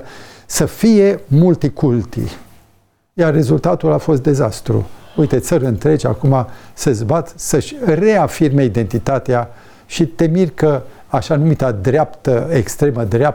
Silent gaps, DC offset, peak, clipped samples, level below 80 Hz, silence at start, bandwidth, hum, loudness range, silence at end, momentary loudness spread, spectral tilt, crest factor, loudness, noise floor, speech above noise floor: none; under 0.1%; -2 dBFS; under 0.1%; -38 dBFS; 0 s; 19 kHz; none; 1 LU; 0 s; 8 LU; -7 dB/octave; 14 dB; -15 LUFS; -55 dBFS; 41 dB